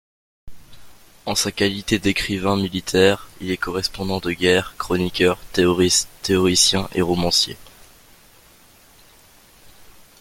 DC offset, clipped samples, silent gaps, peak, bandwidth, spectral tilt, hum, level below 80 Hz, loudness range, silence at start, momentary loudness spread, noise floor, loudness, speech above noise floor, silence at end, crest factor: under 0.1%; under 0.1%; none; 0 dBFS; 17 kHz; -3.5 dB/octave; none; -46 dBFS; 4 LU; 0.45 s; 9 LU; -50 dBFS; -19 LUFS; 31 dB; 2.5 s; 22 dB